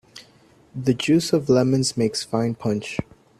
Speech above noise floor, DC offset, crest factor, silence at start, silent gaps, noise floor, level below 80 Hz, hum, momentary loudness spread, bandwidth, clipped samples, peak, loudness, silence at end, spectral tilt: 33 dB; under 0.1%; 18 dB; 0.15 s; none; -54 dBFS; -56 dBFS; none; 10 LU; 14 kHz; under 0.1%; -6 dBFS; -22 LUFS; 0.4 s; -5.5 dB/octave